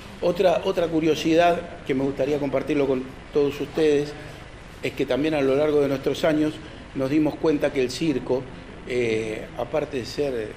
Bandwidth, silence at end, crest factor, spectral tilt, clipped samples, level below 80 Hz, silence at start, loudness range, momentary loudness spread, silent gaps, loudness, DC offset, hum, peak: 15.5 kHz; 0 s; 16 dB; -6 dB/octave; under 0.1%; -46 dBFS; 0 s; 2 LU; 11 LU; none; -24 LUFS; under 0.1%; none; -8 dBFS